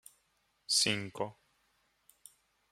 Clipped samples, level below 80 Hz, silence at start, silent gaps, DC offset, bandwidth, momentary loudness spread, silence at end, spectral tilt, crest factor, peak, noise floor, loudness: under 0.1%; -78 dBFS; 0.7 s; none; under 0.1%; 16 kHz; 15 LU; 1.4 s; -1.5 dB/octave; 24 dB; -14 dBFS; -76 dBFS; -32 LUFS